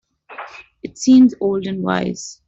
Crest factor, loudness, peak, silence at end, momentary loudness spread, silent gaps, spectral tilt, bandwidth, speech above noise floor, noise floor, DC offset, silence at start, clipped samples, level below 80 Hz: 14 dB; -16 LUFS; -4 dBFS; 0.15 s; 23 LU; none; -5.5 dB/octave; 7.8 kHz; 21 dB; -37 dBFS; under 0.1%; 0.3 s; under 0.1%; -56 dBFS